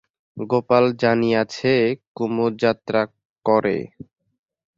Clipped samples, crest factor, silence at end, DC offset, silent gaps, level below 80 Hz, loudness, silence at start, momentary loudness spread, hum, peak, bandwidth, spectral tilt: under 0.1%; 18 dB; 0.9 s; under 0.1%; 2.07-2.15 s, 3.25-3.36 s; -60 dBFS; -20 LUFS; 0.35 s; 10 LU; none; -2 dBFS; 7.6 kHz; -6.5 dB/octave